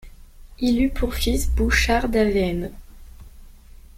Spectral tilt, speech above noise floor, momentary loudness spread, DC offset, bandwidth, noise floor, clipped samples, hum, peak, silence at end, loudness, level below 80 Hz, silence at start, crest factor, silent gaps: -5 dB/octave; 24 dB; 7 LU; under 0.1%; 16.5 kHz; -44 dBFS; under 0.1%; none; -6 dBFS; 0.25 s; -21 LUFS; -28 dBFS; 0.05 s; 16 dB; none